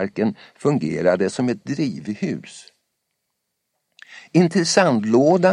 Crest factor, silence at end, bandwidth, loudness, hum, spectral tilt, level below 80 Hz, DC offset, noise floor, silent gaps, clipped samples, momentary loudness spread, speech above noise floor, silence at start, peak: 20 dB; 0 s; 11 kHz; -20 LUFS; none; -5.5 dB/octave; -64 dBFS; under 0.1%; -76 dBFS; none; under 0.1%; 10 LU; 57 dB; 0 s; -2 dBFS